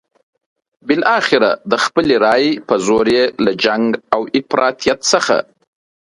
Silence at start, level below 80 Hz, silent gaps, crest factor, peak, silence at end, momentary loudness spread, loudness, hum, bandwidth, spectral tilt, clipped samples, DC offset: 0.85 s; -54 dBFS; none; 16 dB; 0 dBFS; 0.7 s; 5 LU; -14 LUFS; none; 11.5 kHz; -3.5 dB/octave; under 0.1%; under 0.1%